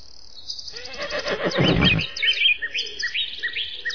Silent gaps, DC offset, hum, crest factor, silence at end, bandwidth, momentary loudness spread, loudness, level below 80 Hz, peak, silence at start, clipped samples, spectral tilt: none; 1%; none; 18 dB; 0 s; 5.4 kHz; 14 LU; -21 LUFS; -42 dBFS; -6 dBFS; 0 s; under 0.1%; -4 dB/octave